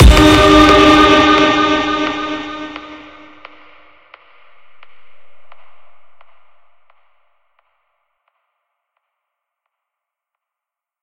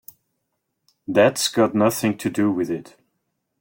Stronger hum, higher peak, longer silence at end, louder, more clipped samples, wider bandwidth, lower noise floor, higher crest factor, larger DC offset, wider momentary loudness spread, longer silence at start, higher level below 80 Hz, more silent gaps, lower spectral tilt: neither; first, 0 dBFS vs -4 dBFS; first, 5.15 s vs 0.8 s; first, -9 LUFS vs -20 LUFS; first, 0.3% vs under 0.1%; about the same, 15.5 kHz vs 17 kHz; first, -86 dBFS vs -76 dBFS; about the same, 16 dB vs 18 dB; neither; first, 21 LU vs 10 LU; second, 0 s vs 1.1 s; first, -22 dBFS vs -62 dBFS; neither; about the same, -5 dB/octave vs -4.5 dB/octave